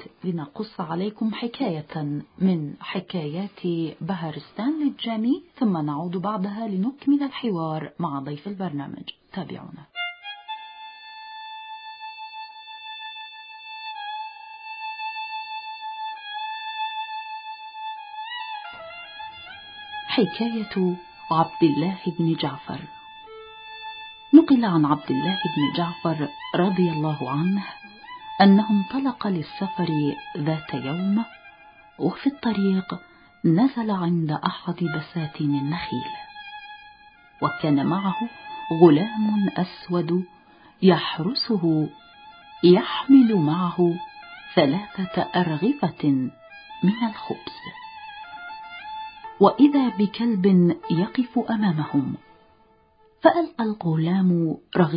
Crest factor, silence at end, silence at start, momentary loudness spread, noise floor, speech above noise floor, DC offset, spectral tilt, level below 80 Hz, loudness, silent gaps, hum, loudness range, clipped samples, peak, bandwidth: 22 dB; 0 s; 0 s; 19 LU; -58 dBFS; 36 dB; under 0.1%; -11.5 dB/octave; -64 dBFS; -23 LUFS; none; none; 13 LU; under 0.1%; -2 dBFS; 5.2 kHz